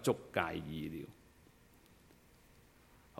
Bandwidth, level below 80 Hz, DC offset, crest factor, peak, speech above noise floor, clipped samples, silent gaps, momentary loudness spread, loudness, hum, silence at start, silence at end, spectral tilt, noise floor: 16.5 kHz; -66 dBFS; under 0.1%; 28 dB; -14 dBFS; 26 dB; under 0.1%; none; 25 LU; -40 LUFS; none; 0 s; 0 s; -5 dB/octave; -64 dBFS